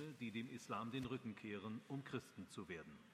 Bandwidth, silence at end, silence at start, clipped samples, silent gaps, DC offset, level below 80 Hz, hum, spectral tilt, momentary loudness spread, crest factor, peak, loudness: 15 kHz; 0 s; 0 s; under 0.1%; none; under 0.1%; -80 dBFS; none; -6 dB/octave; 7 LU; 20 dB; -30 dBFS; -50 LUFS